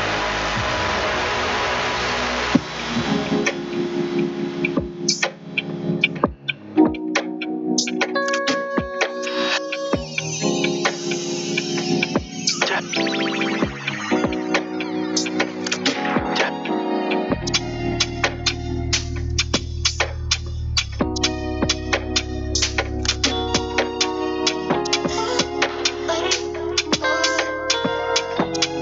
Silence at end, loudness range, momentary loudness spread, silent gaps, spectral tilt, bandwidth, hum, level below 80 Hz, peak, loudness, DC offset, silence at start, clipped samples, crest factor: 0 s; 1 LU; 4 LU; none; -3.5 dB/octave; 8.2 kHz; none; -36 dBFS; -2 dBFS; -21 LUFS; under 0.1%; 0 s; under 0.1%; 20 dB